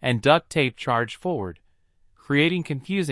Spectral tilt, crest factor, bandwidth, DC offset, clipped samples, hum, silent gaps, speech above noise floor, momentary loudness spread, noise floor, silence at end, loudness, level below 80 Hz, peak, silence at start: -6 dB/octave; 20 dB; 12 kHz; under 0.1%; under 0.1%; none; none; 37 dB; 9 LU; -60 dBFS; 0 s; -23 LUFS; -58 dBFS; -4 dBFS; 0 s